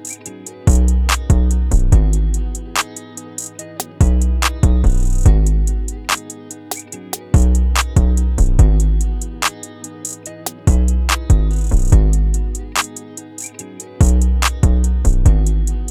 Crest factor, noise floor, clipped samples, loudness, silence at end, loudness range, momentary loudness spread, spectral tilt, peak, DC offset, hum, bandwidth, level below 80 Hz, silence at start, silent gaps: 14 dB; -34 dBFS; under 0.1%; -16 LUFS; 0 s; 1 LU; 15 LU; -5 dB/octave; 0 dBFS; under 0.1%; none; 16.5 kHz; -16 dBFS; 0 s; none